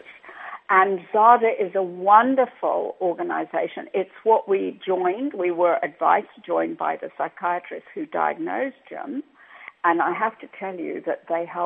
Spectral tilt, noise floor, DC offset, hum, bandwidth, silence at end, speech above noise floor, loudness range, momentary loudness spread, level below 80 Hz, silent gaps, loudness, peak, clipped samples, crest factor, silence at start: -9 dB/octave; -41 dBFS; under 0.1%; none; 3.9 kHz; 0 s; 18 dB; 7 LU; 17 LU; -84 dBFS; none; -22 LUFS; -2 dBFS; under 0.1%; 22 dB; 0.1 s